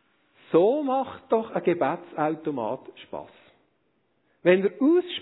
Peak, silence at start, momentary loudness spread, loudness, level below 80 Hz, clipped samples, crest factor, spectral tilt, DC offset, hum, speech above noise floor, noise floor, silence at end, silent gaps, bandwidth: -6 dBFS; 0.5 s; 16 LU; -25 LUFS; -74 dBFS; under 0.1%; 20 dB; -10 dB/octave; under 0.1%; none; 46 dB; -71 dBFS; 0 s; none; 4.1 kHz